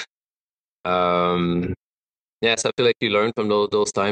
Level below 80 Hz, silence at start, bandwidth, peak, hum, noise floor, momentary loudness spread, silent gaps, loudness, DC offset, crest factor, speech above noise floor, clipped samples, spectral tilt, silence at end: -56 dBFS; 0 s; 10 kHz; -6 dBFS; none; under -90 dBFS; 11 LU; 0.10-0.84 s, 1.77-2.40 s; -21 LUFS; under 0.1%; 16 dB; over 70 dB; under 0.1%; -4.5 dB/octave; 0 s